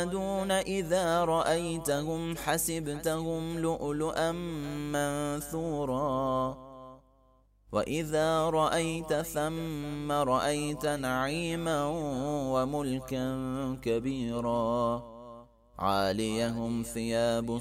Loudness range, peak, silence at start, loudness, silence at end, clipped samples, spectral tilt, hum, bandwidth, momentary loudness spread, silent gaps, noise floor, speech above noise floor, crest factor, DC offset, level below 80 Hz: 3 LU; -14 dBFS; 0 s; -31 LUFS; 0 s; under 0.1%; -5 dB/octave; 50 Hz at -50 dBFS; 16 kHz; 7 LU; none; -64 dBFS; 34 dB; 18 dB; under 0.1%; -52 dBFS